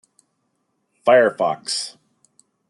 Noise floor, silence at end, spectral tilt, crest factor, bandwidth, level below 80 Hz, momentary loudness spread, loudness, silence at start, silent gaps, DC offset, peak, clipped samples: -71 dBFS; 0.8 s; -2.5 dB/octave; 20 dB; 11.5 kHz; -80 dBFS; 11 LU; -18 LUFS; 1.05 s; none; under 0.1%; -2 dBFS; under 0.1%